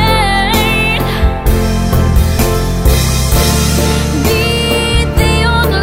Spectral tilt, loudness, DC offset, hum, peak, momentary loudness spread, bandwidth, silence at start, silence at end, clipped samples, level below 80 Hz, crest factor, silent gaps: -4.5 dB/octave; -12 LUFS; 1%; none; 0 dBFS; 3 LU; 16.5 kHz; 0 s; 0 s; under 0.1%; -16 dBFS; 10 dB; none